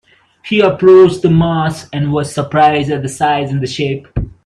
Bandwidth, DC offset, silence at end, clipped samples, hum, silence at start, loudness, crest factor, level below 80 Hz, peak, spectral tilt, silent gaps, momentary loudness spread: 11.5 kHz; under 0.1%; 0.15 s; under 0.1%; none; 0.45 s; -12 LUFS; 12 dB; -36 dBFS; 0 dBFS; -6.5 dB/octave; none; 11 LU